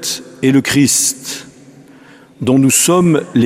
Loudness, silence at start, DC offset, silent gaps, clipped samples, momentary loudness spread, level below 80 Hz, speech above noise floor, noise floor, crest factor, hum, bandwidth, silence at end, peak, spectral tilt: -12 LUFS; 0 s; under 0.1%; none; under 0.1%; 13 LU; -52 dBFS; 29 dB; -41 dBFS; 14 dB; none; 15.5 kHz; 0 s; 0 dBFS; -4 dB/octave